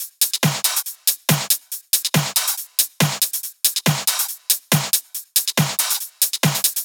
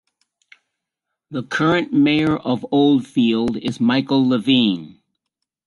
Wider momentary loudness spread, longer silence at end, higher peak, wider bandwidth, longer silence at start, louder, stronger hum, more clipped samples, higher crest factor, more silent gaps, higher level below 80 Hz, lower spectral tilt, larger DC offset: second, 3 LU vs 7 LU; second, 0 s vs 0.8 s; about the same, -2 dBFS vs -4 dBFS; first, over 20 kHz vs 11.5 kHz; second, 0 s vs 1.3 s; about the same, -18 LUFS vs -18 LUFS; neither; neither; about the same, 20 dB vs 16 dB; neither; second, -76 dBFS vs -56 dBFS; second, -2.5 dB/octave vs -6.5 dB/octave; neither